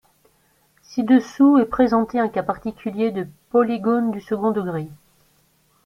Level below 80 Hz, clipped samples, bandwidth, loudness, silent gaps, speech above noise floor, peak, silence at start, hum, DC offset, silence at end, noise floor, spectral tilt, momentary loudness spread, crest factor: -54 dBFS; under 0.1%; 7 kHz; -20 LUFS; none; 42 dB; -4 dBFS; 0.9 s; none; under 0.1%; 0.9 s; -61 dBFS; -7.5 dB/octave; 13 LU; 16 dB